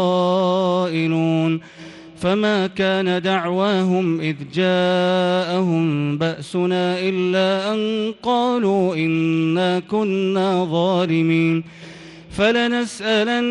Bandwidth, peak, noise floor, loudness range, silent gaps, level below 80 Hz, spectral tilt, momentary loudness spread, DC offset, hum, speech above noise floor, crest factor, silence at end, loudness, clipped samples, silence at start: 11 kHz; -6 dBFS; -39 dBFS; 1 LU; none; -56 dBFS; -6.5 dB/octave; 5 LU; under 0.1%; none; 20 dB; 14 dB; 0 s; -19 LUFS; under 0.1%; 0 s